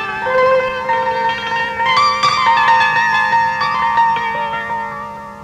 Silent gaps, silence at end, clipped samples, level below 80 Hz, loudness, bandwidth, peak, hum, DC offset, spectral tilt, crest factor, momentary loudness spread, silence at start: none; 0 s; under 0.1%; -50 dBFS; -14 LUFS; 11 kHz; -2 dBFS; none; under 0.1%; -3 dB/octave; 12 dB; 9 LU; 0 s